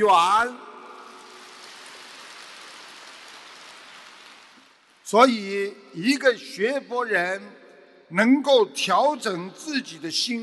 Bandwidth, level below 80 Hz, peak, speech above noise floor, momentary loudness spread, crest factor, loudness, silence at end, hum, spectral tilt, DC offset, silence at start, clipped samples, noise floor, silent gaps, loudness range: 12.5 kHz; -74 dBFS; -4 dBFS; 33 dB; 25 LU; 22 dB; -22 LUFS; 0 s; none; -3.5 dB/octave; under 0.1%; 0 s; under 0.1%; -55 dBFS; none; 19 LU